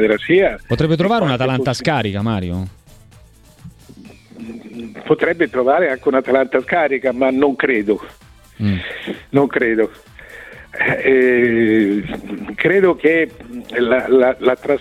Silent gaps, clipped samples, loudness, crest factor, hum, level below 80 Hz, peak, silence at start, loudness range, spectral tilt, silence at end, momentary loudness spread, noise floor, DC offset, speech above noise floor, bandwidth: none; under 0.1%; -16 LUFS; 16 dB; none; -46 dBFS; -2 dBFS; 0 s; 7 LU; -7 dB/octave; 0 s; 18 LU; -45 dBFS; under 0.1%; 29 dB; 12.5 kHz